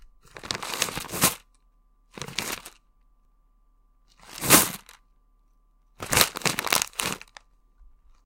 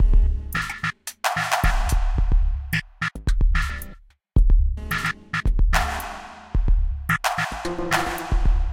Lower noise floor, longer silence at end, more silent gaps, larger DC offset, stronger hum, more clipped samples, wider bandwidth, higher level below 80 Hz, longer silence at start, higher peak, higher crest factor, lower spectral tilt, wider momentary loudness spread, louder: first, -62 dBFS vs -44 dBFS; first, 0.4 s vs 0 s; neither; neither; neither; neither; about the same, 17 kHz vs 16.5 kHz; second, -52 dBFS vs -22 dBFS; first, 0.35 s vs 0 s; first, 0 dBFS vs -6 dBFS; first, 30 dB vs 14 dB; second, -1.5 dB/octave vs -4.5 dB/octave; first, 23 LU vs 7 LU; about the same, -24 LUFS vs -24 LUFS